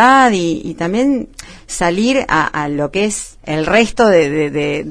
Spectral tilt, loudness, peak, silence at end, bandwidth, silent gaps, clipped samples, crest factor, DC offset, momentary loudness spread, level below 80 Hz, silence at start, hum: -4.5 dB/octave; -15 LUFS; 0 dBFS; 0 s; 11 kHz; none; under 0.1%; 14 dB; under 0.1%; 10 LU; -38 dBFS; 0 s; none